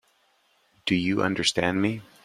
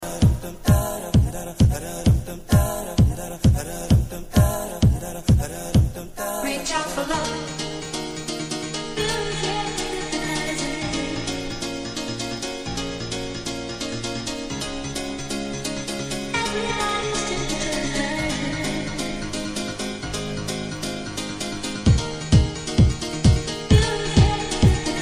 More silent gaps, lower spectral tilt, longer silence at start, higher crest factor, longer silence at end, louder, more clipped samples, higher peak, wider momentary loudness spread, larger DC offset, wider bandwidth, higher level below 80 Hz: neither; about the same, -4 dB/octave vs -5 dB/octave; first, 0.85 s vs 0 s; about the same, 22 dB vs 20 dB; first, 0.25 s vs 0 s; about the same, -25 LUFS vs -23 LUFS; neither; about the same, -6 dBFS vs -4 dBFS; second, 5 LU vs 9 LU; neither; about the same, 15 kHz vs 15.5 kHz; second, -60 dBFS vs -30 dBFS